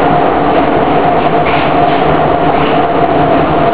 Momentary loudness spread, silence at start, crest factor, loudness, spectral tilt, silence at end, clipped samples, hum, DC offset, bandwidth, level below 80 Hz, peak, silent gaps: 1 LU; 0 s; 10 dB; -10 LUFS; -10 dB/octave; 0 s; 0.2%; none; 8%; 4 kHz; -30 dBFS; 0 dBFS; none